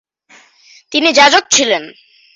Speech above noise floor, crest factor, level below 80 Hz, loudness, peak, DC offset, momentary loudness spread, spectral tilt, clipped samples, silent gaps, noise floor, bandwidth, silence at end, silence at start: 36 dB; 14 dB; -58 dBFS; -10 LUFS; 0 dBFS; under 0.1%; 11 LU; 0 dB/octave; under 0.1%; none; -47 dBFS; 8.2 kHz; 0.45 s; 0.9 s